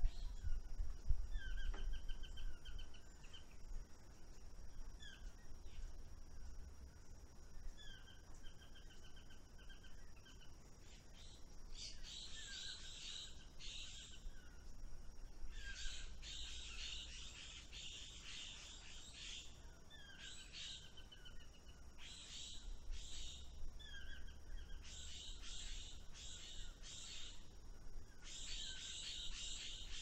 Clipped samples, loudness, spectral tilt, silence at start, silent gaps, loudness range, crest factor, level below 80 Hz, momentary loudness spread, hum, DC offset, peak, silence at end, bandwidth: under 0.1%; -54 LUFS; -2 dB/octave; 0 s; none; 9 LU; 26 dB; -50 dBFS; 14 LU; none; under 0.1%; -22 dBFS; 0 s; 9.4 kHz